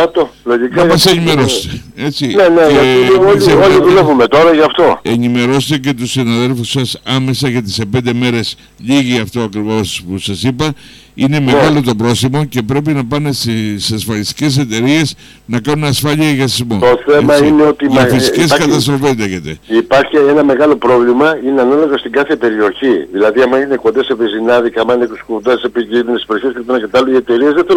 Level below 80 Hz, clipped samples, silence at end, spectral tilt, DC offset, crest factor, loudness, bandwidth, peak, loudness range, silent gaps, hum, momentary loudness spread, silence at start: -40 dBFS; under 0.1%; 0 s; -5.5 dB/octave; under 0.1%; 10 dB; -11 LUFS; 17 kHz; 0 dBFS; 6 LU; none; none; 9 LU; 0 s